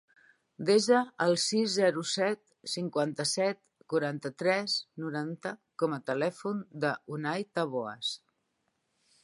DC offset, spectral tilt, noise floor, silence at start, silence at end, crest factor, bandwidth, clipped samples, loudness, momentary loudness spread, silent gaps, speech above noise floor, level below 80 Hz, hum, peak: under 0.1%; -4 dB/octave; -78 dBFS; 0.6 s; 1.05 s; 20 dB; 11.5 kHz; under 0.1%; -31 LUFS; 10 LU; none; 48 dB; -82 dBFS; none; -12 dBFS